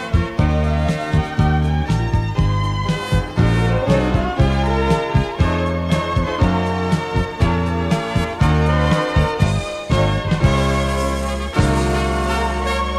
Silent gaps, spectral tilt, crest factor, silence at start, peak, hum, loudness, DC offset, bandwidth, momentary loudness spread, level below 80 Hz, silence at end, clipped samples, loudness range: none; -6.5 dB/octave; 14 dB; 0 s; -4 dBFS; none; -18 LUFS; under 0.1%; 13 kHz; 4 LU; -24 dBFS; 0 s; under 0.1%; 1 LU